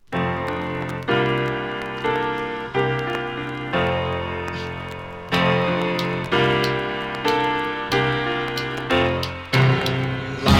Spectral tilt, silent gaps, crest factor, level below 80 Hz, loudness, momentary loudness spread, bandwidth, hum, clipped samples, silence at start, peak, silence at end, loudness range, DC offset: -6 dB/octave; none; 20 dB; -42 dBFS; -22 LUFS; 8 LU; 16 kHz; none; under 0.1%; 0.1 s; -2 dBFS; 0 s; 3 LU; under 0.1%